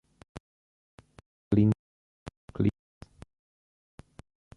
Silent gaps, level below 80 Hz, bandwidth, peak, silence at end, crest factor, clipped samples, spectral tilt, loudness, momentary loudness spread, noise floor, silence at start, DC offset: 0.40-0.98 s, 1.26-1.51 s, 1.79-2.26 s, 2.37-2.48 s; -54 dBFS; 10.5 kHz; -12 dBFS; 1.85 s; 22 dB; under 0.1%; -9.5 dB/octave; -28 LUFS; 27 LU; under -90 dBFS; 0.35 s; under 0.1%